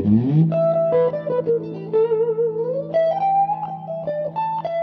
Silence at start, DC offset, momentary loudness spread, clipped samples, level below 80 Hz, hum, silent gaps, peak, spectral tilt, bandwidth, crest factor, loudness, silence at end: 0 s; under 0.1%; 8 LU; under 0.1%; -56 dBFS; none; none; -6 dBFS; -11 dB/octave; 5 kHz; 14 dB; -20 LUFS; 0 s